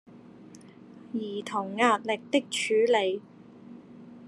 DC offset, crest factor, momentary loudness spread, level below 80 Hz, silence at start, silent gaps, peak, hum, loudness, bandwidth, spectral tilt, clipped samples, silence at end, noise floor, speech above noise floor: under 0.1%; 22 dB; 24 LU; -80 dBFS; 0.15 s; none; -8 dBFS; none; -27 LUFS; 12 kHz; -3.5 dB/octave; under 0.1%; 0 s; -50 dBFS; 23 dB